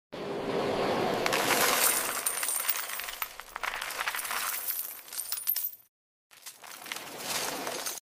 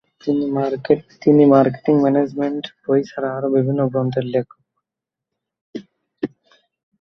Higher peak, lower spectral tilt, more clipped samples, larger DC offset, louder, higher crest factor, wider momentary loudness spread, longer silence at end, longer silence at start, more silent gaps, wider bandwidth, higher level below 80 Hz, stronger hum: second, -8 dBFS vs -2 dBFS; second, -1 dB/octave vs -9 dB/octave; neither; neither; second, -30 LUFS vs -18 LUFS; first, 24 dB vs 18 dB; about the same, 14 LU vs 16 LU; second, 0.05 s vs 0.75 s; second, 0.1 s vs 0.25 s; first, 5.88-6.30 s vs 5.61-5.73 s; first, 16 kHz vs 6.2 kHz; about the same, -64 dBFS vs -62 dBFS; neither